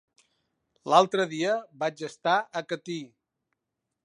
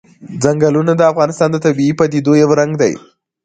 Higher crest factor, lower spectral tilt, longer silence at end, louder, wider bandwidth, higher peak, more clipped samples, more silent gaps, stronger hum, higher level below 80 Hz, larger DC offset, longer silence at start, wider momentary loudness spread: first, 24 dB vs 14 dB; second, -4.5 dB/octave vs -6.5 dB/octave; first, 1 s vs 0.45 s; second, -27 LUFS vs -13 LUFS; first, 11 kHz vs 9.4 kHz; second, -6 dBFS vs 0 dBFS; neither; neither; neither; second, -82 dBFS vs -52 dBFS; neither; first, 0.85 s vs 0.2 s; first, 14 LU vs 6 LU